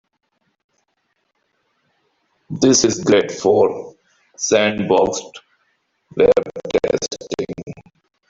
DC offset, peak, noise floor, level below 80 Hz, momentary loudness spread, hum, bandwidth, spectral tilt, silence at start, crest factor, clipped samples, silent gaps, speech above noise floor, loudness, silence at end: under 0.1%; -2 dBFS; -69 dBFS; -52 dBFS; 17 LU; none; 7.8 kHz; -3.5 dB/octave; 2.5 s; 18 dB; under 0.1%; none; 53 dB; -17 LUFS; 0.5 s